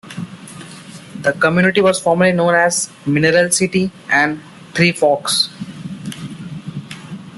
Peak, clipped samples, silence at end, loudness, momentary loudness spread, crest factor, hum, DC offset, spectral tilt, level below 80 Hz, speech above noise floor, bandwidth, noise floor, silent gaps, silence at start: -2 dBFS; under 0.1%; 0 s; -15 LUFS; 19 LU; 16 dB; none; under 0.1%; -4 dB/octave; -54 dBFS; 21 dB; 12.5 kHz; -36 dBFS; none; 0.05 s